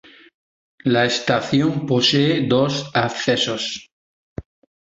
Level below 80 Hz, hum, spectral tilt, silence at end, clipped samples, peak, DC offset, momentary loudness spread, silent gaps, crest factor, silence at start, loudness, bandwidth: -52 dBFS; none; -5 dB/octave; 0.45 s; under 0.1%; -4 dBFS; under 0.1%; 19 LU; 3.92-4.36 s; 18 dB; 0.85 s; -19 LUFS; 8 kHz